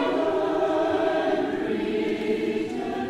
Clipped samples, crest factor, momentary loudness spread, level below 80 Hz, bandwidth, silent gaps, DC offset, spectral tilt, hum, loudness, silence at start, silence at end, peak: under 0.1%; 14 dB; 4 LU; -56 dBFS; 12 kHz; none; under 0.1%; -6 dB/octave; none; -25 LUFS; 0 s; 0 s; -12 dBFS